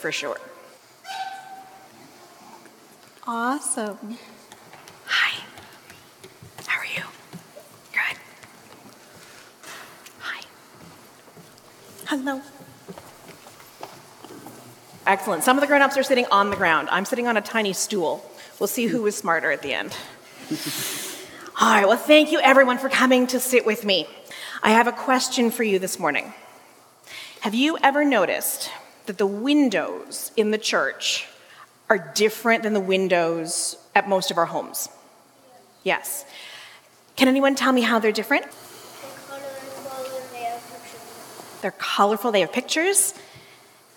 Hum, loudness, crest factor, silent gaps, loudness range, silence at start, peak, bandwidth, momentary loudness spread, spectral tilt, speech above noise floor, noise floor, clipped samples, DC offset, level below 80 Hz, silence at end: none; -21 LUFS; 24 dB; none; 15 LU; 0 s; 0 dBFS; 17.5 kHz; 22 LU; -2.5 dB/octave; 32 dB; -53 dBFS; under 0.1%; under 0.1%; -74 dBFS; 0.6 s